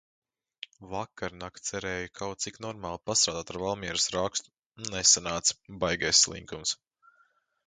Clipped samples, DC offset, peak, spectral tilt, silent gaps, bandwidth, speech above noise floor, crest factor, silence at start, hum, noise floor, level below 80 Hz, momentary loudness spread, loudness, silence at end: under 0.1%; under 0.1%; -6 dBFS; -1 dB/octave; 4.66-4.70 s; 11 kHz; 39 dB; 26 dB; 0.8 s; none; -69 dBFS; -56 dBFS; 16 LU; -28 LUFS; 0.9 s